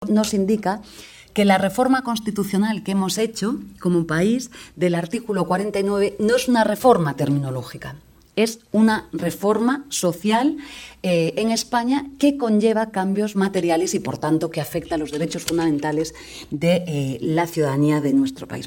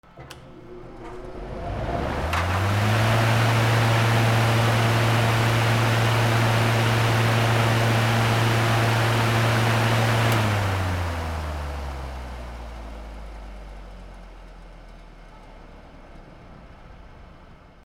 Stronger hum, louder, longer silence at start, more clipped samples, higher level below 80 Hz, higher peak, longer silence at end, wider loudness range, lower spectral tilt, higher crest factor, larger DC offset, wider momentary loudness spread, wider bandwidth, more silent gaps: neither; about the same, -21 LUFS vs -21 LUFS; second, 0 s vs 0.15 s; neither; second, -54 dBFS vs -40 dBFS; first, -2 dBFS vs -8 dBFS; second, 0 s vs 0.35 s; second, 2 LU vs 17 LU; about the same, -5.5 dB/octave vs -5.5 dB/octave; about the same, 20 dB vs 16 dB; neither; second, 9 LU vs 20 LU; about the same, 18 kHz vs 16.5 kHz; neither